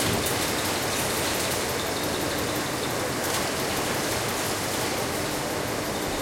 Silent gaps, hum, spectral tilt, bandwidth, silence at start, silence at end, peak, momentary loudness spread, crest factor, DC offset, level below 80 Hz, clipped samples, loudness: none; none; -3 dB/octave; 16.5 kHz; 0 s; 0 s; -12 dBFS; 3 LU; 14 dB; under 0.1%; -48 dBFS; under 0.1%; -26 LUFS